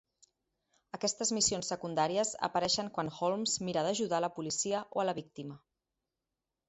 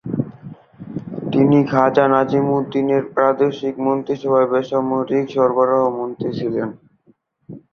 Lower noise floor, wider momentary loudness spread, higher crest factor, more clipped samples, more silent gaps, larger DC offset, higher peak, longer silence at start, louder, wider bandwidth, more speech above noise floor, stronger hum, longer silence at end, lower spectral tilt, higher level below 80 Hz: first, -89 dBFS vs -58 dBFS; second, 8 LU vs 14 LU; about the same, 18 dB vs 18 dB; neither; neither; neither; second, -16 dBFS vs 0 dBFS; first, 0.95 s vs 0.05 s; second, -33 LUFS vs -18 LUFS; first, 8 kHz vs 6.6 kHz; first, 56 dB vs 41 dB; neither; first, 1.1 s vs 0.15 s; second, -3 dB/octave vs -8.5 dB/octave; second, -70 dBFS vs -58 dBFS